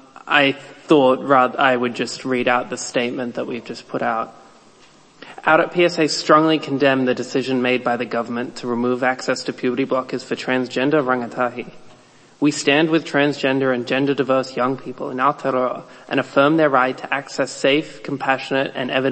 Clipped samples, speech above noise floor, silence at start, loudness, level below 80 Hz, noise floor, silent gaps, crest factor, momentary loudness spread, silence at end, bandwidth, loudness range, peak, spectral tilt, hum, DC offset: under 0.1%; 31 dB; 0.15 s; -19 LUFS; -64 dBFS; -50 dBFS; none; 18 dB; 10 LU; 0 s; 8.8 kHz; 4 LU; 0 dBFS; -4.5 dB/octave; none; under 0.1%